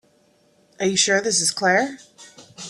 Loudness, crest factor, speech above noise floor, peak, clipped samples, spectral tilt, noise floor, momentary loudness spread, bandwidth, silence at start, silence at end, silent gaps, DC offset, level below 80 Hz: -19 LUFS; 20 dB; 40 dB; -4 dBFS; under 0.1%; -2 dB/octave; -60 dBFS; 10 LU; 14 kHz; 0.8 s; 0 s; none; under 0.1%; -68 dBFS